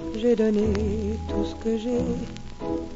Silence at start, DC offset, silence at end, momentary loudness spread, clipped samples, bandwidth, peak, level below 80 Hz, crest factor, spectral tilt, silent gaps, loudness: 0 s; under 0.1%; 0 s; 10 LU; under 0.1%; 8 kHz; -12 dBFS; -38 dBFS; 14 dB; -7.5 dB/octave; none; -26 LUFS